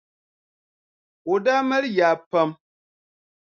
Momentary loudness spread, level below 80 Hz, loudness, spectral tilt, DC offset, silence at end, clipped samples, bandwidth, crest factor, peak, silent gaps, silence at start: 6 LU; -78 dBFS; -21 LUFS; -5.5 dB/octave; under 0.1%; 0.9 s; under 0.1%; 7 kHz; 18 dB; -6 dBFS; 2.26-2.31 s; 1.25 s